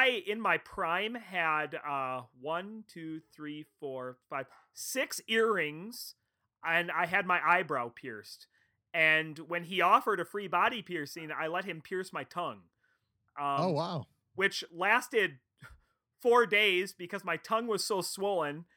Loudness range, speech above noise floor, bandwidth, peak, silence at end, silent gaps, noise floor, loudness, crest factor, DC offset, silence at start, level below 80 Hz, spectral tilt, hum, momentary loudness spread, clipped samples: 7 LU; 44 dB; over 20 kHz; -10 dBFS; 0.15 s; none; -77 dBFS; -31 LUFS; 22 dB; under 0.1%; 0 s; -74 dBFS; -3.5 dB/octave; none; 18 LU; under 0.1%